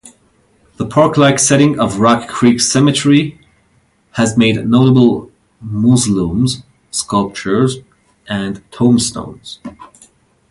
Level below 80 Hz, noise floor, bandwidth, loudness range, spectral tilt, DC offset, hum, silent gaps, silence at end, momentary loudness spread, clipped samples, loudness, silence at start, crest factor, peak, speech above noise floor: -44 dBFS; -56 dBFS; 11.5 kHz; 5 LU; -5 dB/octave; under 0.1%; none; none; 0.65 s; 16 LU; under 0.1%; -13 LUFS; 0.8 s; 14 dB; 0 dBFS; 43 dB